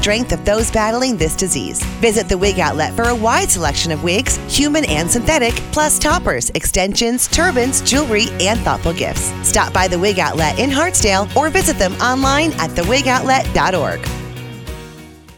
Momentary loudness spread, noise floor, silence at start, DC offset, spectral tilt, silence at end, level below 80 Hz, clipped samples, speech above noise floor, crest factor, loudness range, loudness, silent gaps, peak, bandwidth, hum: 5 LU; -37 dBFS; 0 s; under 0.1%; -3 dB/octave; 0.05 s; -28 dBFS; under 0.1%; 22 dB; 14 dB; 1 LU; -15 LUFS; none; -2 dBFS; 20 kHz; none